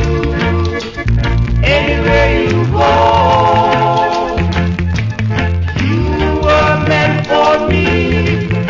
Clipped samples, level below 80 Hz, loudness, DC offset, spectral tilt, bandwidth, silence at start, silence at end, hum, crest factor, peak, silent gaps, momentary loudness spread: under 0.1%; -20 dBFS; -12 LUFS; under 0.1%; -6.5 dB/octave; 7.6 kHz; 0 s; 0 s; none; 12 dB; 0 dBFS; none; 6 LU